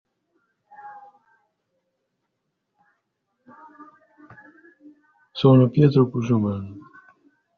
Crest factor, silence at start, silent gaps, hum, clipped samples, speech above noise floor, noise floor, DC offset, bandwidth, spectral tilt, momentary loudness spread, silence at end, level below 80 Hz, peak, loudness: 22 dB; 0.85 s; none; none; under 0.1%; 60 dB; -78 dBFS; under 0.1%; 6.6 kHz; -8.5 dB/octave; 28 LU; 0.8 s; -60 dBFS; -4 dBFS; -19 LUFS